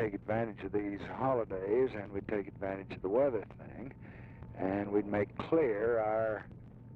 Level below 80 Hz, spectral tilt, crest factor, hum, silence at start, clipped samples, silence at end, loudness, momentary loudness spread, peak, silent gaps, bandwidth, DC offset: -60 dBFS; -9.5 dB/octave; 16 dB; none; 0 s; under 0.1%; 0 s; -34 LUFS; 17 LU; -18 dBFS; none; 5 kHz; under 0.1%